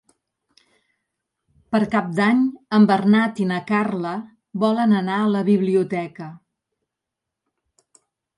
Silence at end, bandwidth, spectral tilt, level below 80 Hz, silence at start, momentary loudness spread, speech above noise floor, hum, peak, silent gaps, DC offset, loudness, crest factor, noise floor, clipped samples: 2 s; 11 kHz; -7.5 dB/octave; -66 dBFS; 1.7 s; 13 LU; 65 dB; none; -4 dBFS; none; under 0.1%; -20 LUFS; 18 dB; -84 dBFS; under 0.1%